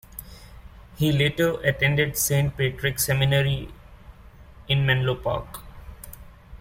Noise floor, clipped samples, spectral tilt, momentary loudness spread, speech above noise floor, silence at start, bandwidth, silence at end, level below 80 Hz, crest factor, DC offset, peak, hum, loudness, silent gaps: -47 dBFS; under 0.1%; -4.5 dB/octave; 20 LU; 24 dB; 0.15 s; 16.5 kHz; 0.05 s; -44 dBFS; 18 dB; under 0.1%; -8 dBFS; none; -23 LUFS; none